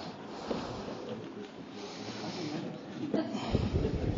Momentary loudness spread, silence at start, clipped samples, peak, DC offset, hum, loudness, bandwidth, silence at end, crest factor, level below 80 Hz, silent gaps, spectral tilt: 11 LU; 0 s; under 0.1%; -14 dBFS; under 0.1%; none; -37 LUFS; 7.6 kHz; 0 s; 22 dB; -48 dBFS; none; -6 dB/octave